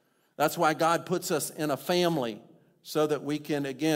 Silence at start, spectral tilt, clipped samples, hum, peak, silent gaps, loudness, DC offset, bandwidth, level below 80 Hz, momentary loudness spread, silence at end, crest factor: 0.4 s; -4.5 dB/octave; under 0.1%; none; -10 dBFS; none; -28 LUFS; under 0.1%; 16 kHz; -74 dBFS; 7 LU; 0 s; 18 dB